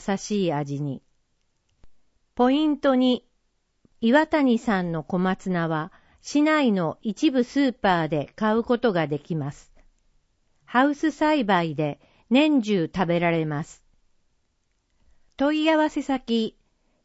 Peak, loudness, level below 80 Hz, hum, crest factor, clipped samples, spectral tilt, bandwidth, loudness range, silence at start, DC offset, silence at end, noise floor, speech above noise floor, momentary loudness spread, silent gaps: -4 dBFS; -23 LUFS; -56 dBFS; none; 20 dB; under 0.1%; -6 dB/octave; 8 kHz; 3 LU; 0 s; under 0.1%; 0.55 s; -71 dBFS; 48 dB; 10 LU; none